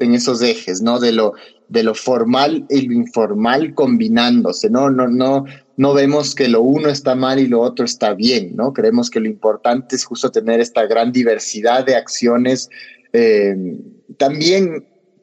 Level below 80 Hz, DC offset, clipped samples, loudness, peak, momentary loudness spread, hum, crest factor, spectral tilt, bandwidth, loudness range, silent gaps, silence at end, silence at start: -64 dBFS; under 0.1%; under 0.1%; -15 LUFS; -2 dBFS; 6 LU; none; 12 dB; -4.5 dB/octave; 8.6 kHz; 2 LU; none; 0.4 s; 0 s